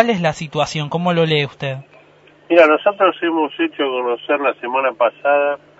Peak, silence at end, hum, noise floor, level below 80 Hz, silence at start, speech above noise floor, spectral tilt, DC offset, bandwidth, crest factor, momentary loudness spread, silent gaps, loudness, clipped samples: 0 dBFS; 0.2 s; 50 Hz at -55 dBFS; -48 dBFS; -58 dBFS; 0 s; 32 dB; -6 dB/octave; under 0.1%; 8 kHz; 18 dB; 9 LU; none; -17 LUFS; under 0.1%